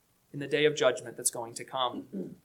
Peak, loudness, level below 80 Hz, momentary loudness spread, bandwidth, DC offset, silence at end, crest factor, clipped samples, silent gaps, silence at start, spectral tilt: -12 dBFS; -30 LUFS; -78 dBFS; 15 LU; 17 kHz; under 0.1%; 0.1 s; 20 dB; under 0.1%; none; 0.35 s; -3 dB/octave